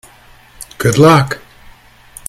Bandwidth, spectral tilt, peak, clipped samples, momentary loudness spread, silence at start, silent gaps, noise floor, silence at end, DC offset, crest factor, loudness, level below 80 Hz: 15.5 kHz; -5.5 dB/octave; 0 dBFS; 0.1%; 25 LU; 0.6 s; none; -43 dBFS; 0.9 s; under 0.1%; 14 dB; -11 LUFS; -42 dBFS